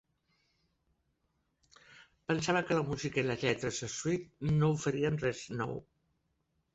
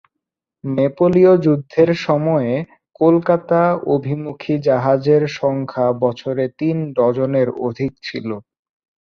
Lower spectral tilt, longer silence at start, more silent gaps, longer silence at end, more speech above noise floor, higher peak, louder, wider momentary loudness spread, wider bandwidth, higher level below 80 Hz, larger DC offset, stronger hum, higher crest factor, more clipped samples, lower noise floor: second, -5.5 dB/octave vs -8.5 dB/octave; first, 1.9 s vs 0.65 s; neither; first, 0.95 s vs 0.7 s; second, 46 dB vs 64 dB; second, -16 dBFS vs -2 dBFS; second, -33 LUFS vs -17 LUFS; second, 8 LU vs 11 LU; first, 8.2 kHz vs 6.8 kHz; about the same, -62 dBFS vs -58 dBFS; neither; neither; about the same, 20 dB vs 16 dB; neither; about the same, -79 dBFS vs -81 dBFS